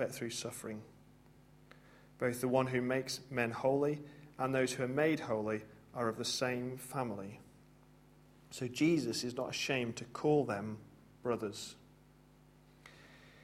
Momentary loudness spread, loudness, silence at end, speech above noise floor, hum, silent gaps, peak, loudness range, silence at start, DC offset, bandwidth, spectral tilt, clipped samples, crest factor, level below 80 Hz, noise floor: 16 LU; -36 LUFS; 0.05 s; 27 dB; none; none; -18 dBFS; 4 LU; 0 s; under 0.1%; 16 kHz; -5 dB/octave; under 0.1%; 20 dB; -70 dBFS; -63 dBFS